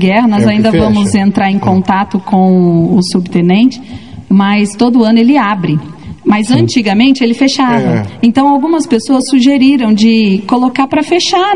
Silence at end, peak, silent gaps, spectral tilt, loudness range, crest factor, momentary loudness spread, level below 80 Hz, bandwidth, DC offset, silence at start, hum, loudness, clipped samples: 0 s; 0 dBFS; none; -6 dB/octave; 1 LU; 8 dB; 5 LU; -42 dBFS; 11 kHz; 0.9%; 0 s; none; -9 LUFS; 0.4%